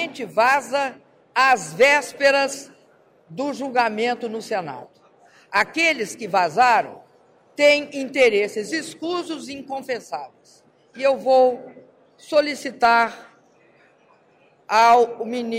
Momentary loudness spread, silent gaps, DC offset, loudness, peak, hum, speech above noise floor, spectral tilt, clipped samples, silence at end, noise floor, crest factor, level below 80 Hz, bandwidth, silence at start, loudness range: 15 LU; none; under 0.1%; -20 LUFS; -6 dBFS; none; 37 dB; -3 dB/octave; under 0.1%; 0 s; -57 dBFS; 16 dB; -68 dBFS; 16 kHz; 0 s; 4 LU